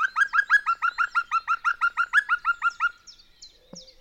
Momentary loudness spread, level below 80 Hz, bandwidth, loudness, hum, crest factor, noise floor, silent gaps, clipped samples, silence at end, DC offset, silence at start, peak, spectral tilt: 5 LU; -62 dBFS; 12 kHz; -23 LUFS; none; 16 dB; -52 dBFS; none; under 0.1%; 0.15 s; under 0.1%; 0 s; -10 dBFS; 0.5 dB/octave